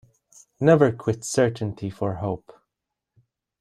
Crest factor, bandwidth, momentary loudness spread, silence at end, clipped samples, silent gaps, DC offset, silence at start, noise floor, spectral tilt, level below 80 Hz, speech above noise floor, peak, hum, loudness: 20 dB; 14.5 kHz; 13 LU; 1.25 s; under 0.1%; none; under 0.1%; 0.6 s; -84 dBFS; -6.5 dB/octave; -58 dBFS; 62 dB; -4 dBFS; none; -23 LUFS